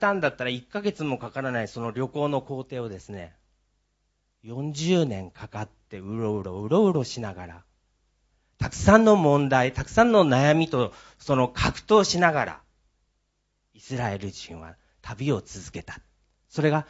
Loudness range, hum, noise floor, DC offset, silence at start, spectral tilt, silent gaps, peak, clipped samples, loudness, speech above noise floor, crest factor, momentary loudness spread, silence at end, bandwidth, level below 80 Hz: 12 LU; none; -74 dBFS; under 0.1%; 0 s; -6 dB/octave; none; -2 dBFS; under 0.1%; -24 LUFS; 50 dB; 24 dB; 21 LU; 0.05 s; 8 kHz; -48 dBFS